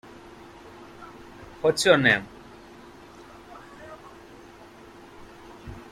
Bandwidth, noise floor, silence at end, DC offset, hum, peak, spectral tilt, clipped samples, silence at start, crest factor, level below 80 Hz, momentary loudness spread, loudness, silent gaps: 16 kHz; -48 dBFS; 0.1 s; under 0.1%; none; -4 dBFS; -4 dB/octave; under 0.1%; 1 s; 26 dB; -56 dBFS; 28 LU; -21 LUFS; none